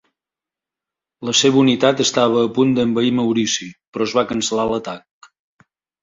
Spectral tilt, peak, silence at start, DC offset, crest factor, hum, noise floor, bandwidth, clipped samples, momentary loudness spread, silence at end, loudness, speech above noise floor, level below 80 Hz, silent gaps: -4 dB/octave; -2 dBFS; 1.2 s; under 0.1%; 18 dB; none; -88 dBFS; 7.8 kHz; under 0.1%; 11 LU; 1.05 s; -17 LUFS; 71 dB; -58 dBFS; 3.87-3.92 s